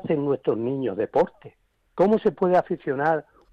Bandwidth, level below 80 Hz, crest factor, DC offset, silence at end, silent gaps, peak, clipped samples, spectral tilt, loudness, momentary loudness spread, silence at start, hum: 7.2 kHz; -60 dBFS; 14 dB; under 0.1%; 0.3 s; none; -10 dBFS; under 0.1%; -9 dB/octave; -24 LUFS; 7 LU; 0 s; none